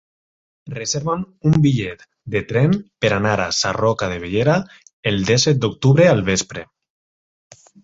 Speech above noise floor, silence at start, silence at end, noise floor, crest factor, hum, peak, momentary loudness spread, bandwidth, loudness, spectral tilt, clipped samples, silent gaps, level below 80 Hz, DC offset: over 72 dB; 0.65 s; 1.2 s; under -90 dBFS; 18 dB; none; 0 dBFS; 13 LU; 8 kHz; -18 LUFS; -5 dB/octave; under 0.1%; 4.93-5.03 s; -46 dBFS; under 0.1%